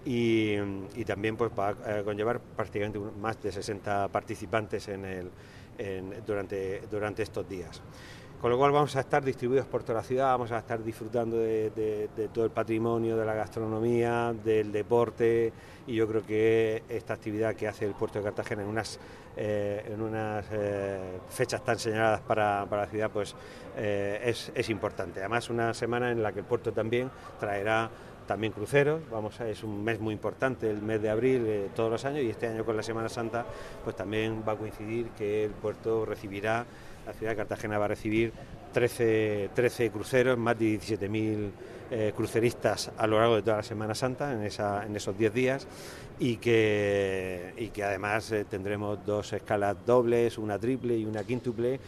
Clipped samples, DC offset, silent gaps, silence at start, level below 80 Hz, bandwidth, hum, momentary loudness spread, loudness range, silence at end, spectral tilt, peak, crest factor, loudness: under 0.1%; under 0.1%; none; 0 s; -56 dBFS; 13.5 kHz; none; 10 LU; 5 LU; 0 s; -6 dB/octave; -10 dBFS; 20 dB; -30 LUFS